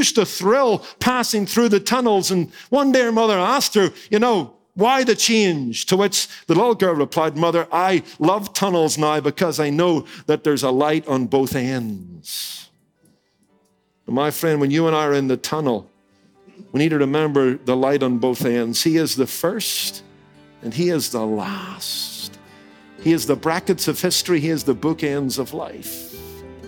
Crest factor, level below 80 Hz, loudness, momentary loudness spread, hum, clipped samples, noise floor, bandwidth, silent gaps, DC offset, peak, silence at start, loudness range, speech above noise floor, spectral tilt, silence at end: 18 dB; -60 dBFS; -19 LUFS; 11 LU; none; under 0.1%; -63 dBFS; 19.5 kHz; none; under 0.1%; -2 dBFS; 0 s; 6 LU; 44 dB; -4 dB/octave; 0 s